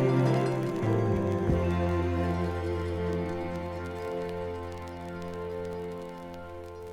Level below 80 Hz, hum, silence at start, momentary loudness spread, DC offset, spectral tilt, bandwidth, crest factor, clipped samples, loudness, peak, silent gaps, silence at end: -46 dBFS; none; 0 s; 13 LU; under 0.1%; -8 dB/octave; 13.5 kHz; 16 dB; under 0.1%; -31 LUFS; -14 dBFS; none; 0 s